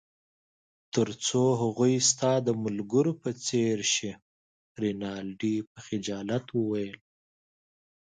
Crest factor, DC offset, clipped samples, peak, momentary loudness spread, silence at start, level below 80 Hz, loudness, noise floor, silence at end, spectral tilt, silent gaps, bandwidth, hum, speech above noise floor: 18 dB; under 0.1%; under 0.1%; -12 dBFS; 11 LU; 0.95 s; -68 dBFS; -28 LUFS; under -90 dBFS; 1.05 s; -4.5 dB/octave; 4.22-4.75 s, 5.67-5.75 s; 9.6 kHz; none; over 62 dB